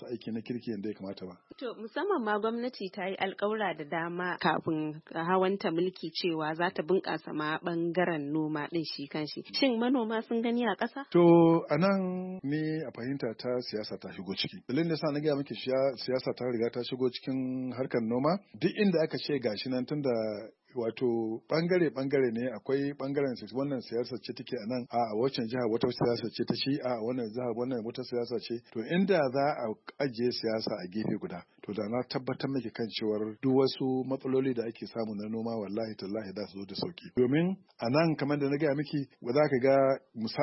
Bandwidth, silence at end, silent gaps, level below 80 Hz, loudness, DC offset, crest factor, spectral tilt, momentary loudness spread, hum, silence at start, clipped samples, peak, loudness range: 6 kHz; 0 s; none; -74 dBFS; -31 LUFS; under 0.1%; 18 dB; -9.5 dB/octave; 10 LU; none; 0 s; under 0.1%; -12 dBFS; 6 LU